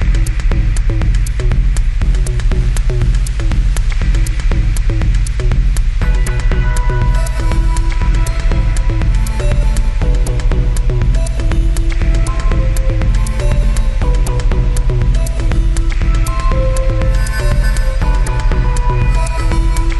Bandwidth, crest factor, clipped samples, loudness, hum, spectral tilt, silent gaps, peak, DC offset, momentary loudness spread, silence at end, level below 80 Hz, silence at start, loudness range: 12 kHz; 8 dB; under 0.1%; -16 LUFS; none; -6 dB/octave; none; -2 dBFS; 2%; 1 LU; 0 s; -12 dBFS; 0 s; 1 LU